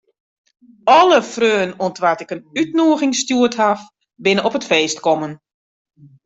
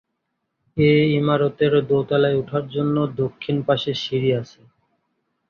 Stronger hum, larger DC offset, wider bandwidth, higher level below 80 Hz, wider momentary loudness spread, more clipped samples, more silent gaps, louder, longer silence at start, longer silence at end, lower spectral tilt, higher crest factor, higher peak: neither; neither; first, 8.2 kHz vs 6.8 kHz; second, -62 dBFS vs -56 dBFS; about the same, 10 LU vs 8 LU; neither; neither; first, -16 LUFS vs -20 LUFS; about the same, 0.85 s vs 0.75 s; second, 0.9 s vs 1.05 s; second, -3.5 dB/octave vs -8 dB/octave; about the same, 16 dB vs 16 dB; about the same, -2 dBFS vs -4 dBFS